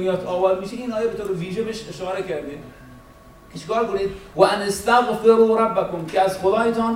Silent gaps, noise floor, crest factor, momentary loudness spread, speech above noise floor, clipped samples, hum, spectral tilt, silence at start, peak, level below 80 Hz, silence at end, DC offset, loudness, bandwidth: none; -46 dBFS; 20 dB; 13 LU; 25 dB; under 0.1%; none; -5 dB/octave; 0 s; -2 dBFS; -50 dBFS; 0 s; under 0.1%; -21 LUFS; 15.5 kHz